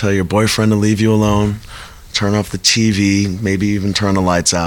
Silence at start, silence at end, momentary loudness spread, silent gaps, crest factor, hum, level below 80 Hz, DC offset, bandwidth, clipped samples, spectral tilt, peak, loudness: 0 s; 0 s; 7 LU; none; 12 dB; none; -36 dBFS; 0.1%; 18 kHz; under 0.1%; -4.5 dB/octave; -2 dBFS; -14 LUFS